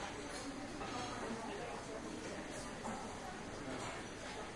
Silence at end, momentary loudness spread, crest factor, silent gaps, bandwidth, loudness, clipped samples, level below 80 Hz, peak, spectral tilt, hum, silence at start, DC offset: 0 s; 3 LU; 14 dB; none; 12 kHz; -45 LUFS; under 0.1%; -60 dBFS; -32 dBFS; -4 dB/octave; none; 0 s; under 0.1%